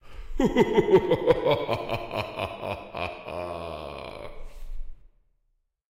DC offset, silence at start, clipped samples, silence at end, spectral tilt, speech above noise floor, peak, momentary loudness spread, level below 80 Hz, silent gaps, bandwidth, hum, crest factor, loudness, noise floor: under 0.1%; 0.05 s; under 0.1%; 0.8 s; -6.5 dB/octave; 51 dB; -8 dBFS; 23 LU; -42 dBFS; none; 15.5 kHz; none; 20 dB; -26 LUFS; -73 dBFS